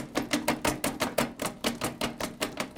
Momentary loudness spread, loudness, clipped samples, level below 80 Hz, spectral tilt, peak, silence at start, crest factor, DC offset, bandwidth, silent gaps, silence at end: 5 LU; -31 LUFS; under 0.1%; -52 dBFS; -3 dB/octave; -12 dBFS; 0 s; 20 dB; under 0.1%; 19 kHz; none; 0 s